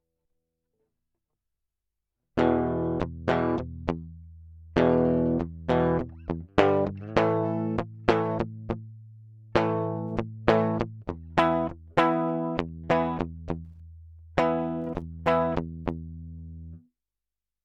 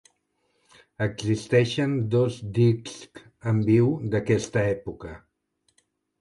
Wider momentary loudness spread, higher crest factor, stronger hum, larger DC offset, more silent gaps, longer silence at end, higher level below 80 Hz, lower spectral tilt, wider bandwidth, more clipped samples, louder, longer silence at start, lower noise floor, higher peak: second, 13 LU vs 16 LU; first, 26 dB vs 18 dB; neither; neither; neither; second, 0.85 s vs 1.05 s; first, -48 dBFS vs -54 dBFS; about the same, -8 dB/octave vs -7 dB/octave; second, 8.4 kHz vs 11.5 kHz; neither; second, -27 LUFS vs -24 LUFS; first, 2.35 s vs 1 s; first, under -90 dBFS vs -72 dBFS; first, -2 dBFS vs -8 dBFS